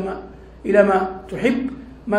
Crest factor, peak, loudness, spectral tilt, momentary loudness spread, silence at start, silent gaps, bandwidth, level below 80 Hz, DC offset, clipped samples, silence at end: 20 dB; -2 dBFS; -20 LUFS; -7 dB/octave; 17 LU; 0 s; none; 11.5 kHz; -44 dBFS; under 0.1%; under 0.1%; 0 s